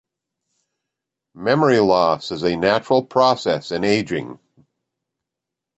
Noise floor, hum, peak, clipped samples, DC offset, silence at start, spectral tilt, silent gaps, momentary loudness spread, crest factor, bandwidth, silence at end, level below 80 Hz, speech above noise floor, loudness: -84 dBFS; none; -2 dBFS; under 0.1%; under 0.1%; 1.35 s; -5.5 dB/octave; none; 11 LU; 18 dB; 8.2 kHz; 1.4 s; -56 dBFS; 66 dB; -18 LUFS